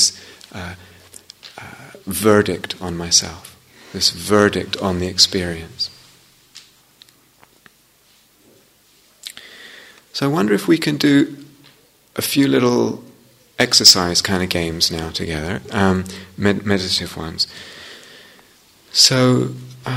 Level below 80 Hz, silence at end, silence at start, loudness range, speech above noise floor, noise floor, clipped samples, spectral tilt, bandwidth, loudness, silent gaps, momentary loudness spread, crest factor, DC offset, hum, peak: -48 dBFS; 0 s; 0 s; 8 LU; 37 dB; -55 dBFS; under 0.1%; -3 dB/octave; 16 kHz; -16 LUFS; none; 23 LU; 20 dB; under 0.1%; none; 0 dBFS